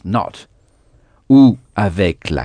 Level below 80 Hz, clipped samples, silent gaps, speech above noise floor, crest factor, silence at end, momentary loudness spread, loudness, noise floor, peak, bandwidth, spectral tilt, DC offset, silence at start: -38 dBFS; under 0.1%; none; 38 dB; 16 dB; 0 s; 11 LU; -14 LUFS; -52 dBFS; 0 dBFS; 9.8 kHz; -8 dB/octave; under 0.1%; 0.05 s